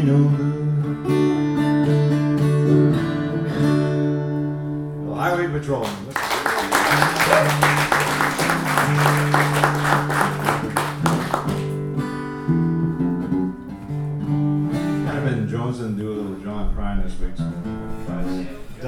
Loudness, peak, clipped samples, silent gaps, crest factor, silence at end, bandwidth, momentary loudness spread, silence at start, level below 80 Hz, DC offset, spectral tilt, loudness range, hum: -21 LUFS; -2 dBFS; under 0.1%; none; 18 dB; 0 s; 18 kHz; 11 LU; 0 s; -36 dBFS; under 0.1%; -6 dB/octave; 7 LU; none